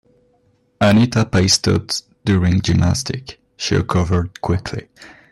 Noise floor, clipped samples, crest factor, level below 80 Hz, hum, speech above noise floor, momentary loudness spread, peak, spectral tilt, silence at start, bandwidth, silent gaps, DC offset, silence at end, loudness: -59 dBFS; under 0.1%; 16 dB; -40 dBFS; none; 43 dB; 12 LU; -2 dBFS; -5 dB/octave; 0.8 s; 12.5 kHz; none; under 0.1%; 0.25 s; -17 LUFS